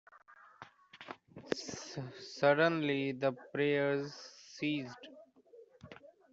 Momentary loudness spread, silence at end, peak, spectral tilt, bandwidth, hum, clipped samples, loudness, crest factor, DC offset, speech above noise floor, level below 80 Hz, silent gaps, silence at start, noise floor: 25 LU; 0.25 s; -14 dBFS; -5 dB/octave; 8 kHz; none; under 0.1%; -34 LUFS; 22 dB; under 0.1%; 26 dB; -78 dBFS; none; 0.3 s; -60 dBFS